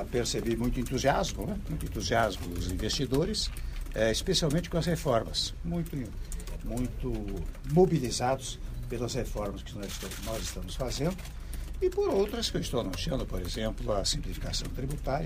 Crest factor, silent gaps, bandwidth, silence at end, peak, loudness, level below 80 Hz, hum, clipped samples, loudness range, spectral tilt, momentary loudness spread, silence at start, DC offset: 20 dB; none; 15.5 kHz; 0 s; -12 dBFS; -31 LUFS; -38 dBFS; none; under 0.1%; 4 LU; -4.5 dB/octave; 11 LU; 0 s; under 0.1%